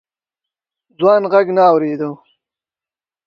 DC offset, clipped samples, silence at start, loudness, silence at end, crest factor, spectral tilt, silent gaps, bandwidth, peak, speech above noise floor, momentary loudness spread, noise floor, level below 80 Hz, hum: under 0.1%; under 0.1%; 1 s; -14 LUFS; 1.1 s; 16 dB; -8 dB/octave; none; 6 kHz; 0 dBFS; over 77 dB; 11 LU; under -90 dBFS; -70 dBFS; none